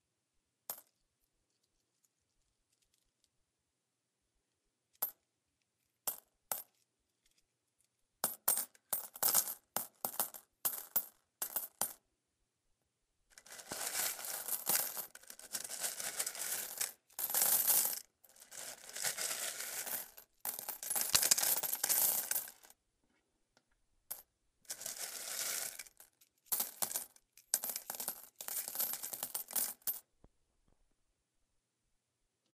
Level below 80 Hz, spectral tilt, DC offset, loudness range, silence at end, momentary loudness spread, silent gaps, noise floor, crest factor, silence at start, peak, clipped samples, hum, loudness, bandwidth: -82 dBFS; 1 dB/octave; under 0.1%; 12 LU; 2.6 s; 18 LU; none; -87 dBFS; 32 dB; 0.7 s; -8 dBFS; under 0.1%; none; -36 LUFS; 16 kHz